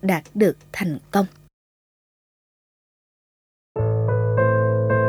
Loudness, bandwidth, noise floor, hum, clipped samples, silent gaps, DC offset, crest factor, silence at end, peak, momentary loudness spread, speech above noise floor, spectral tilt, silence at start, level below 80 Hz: -22 LUFS; 16 kHz; under -90 dBFS; none; under 0.1%; 1.53-3.75 s; under 0.1%; 18 dB; 0 s; -4 dBFS; 8 LU; over 68 dB; -8 dB/octave; 0.05 s; -52 dBFS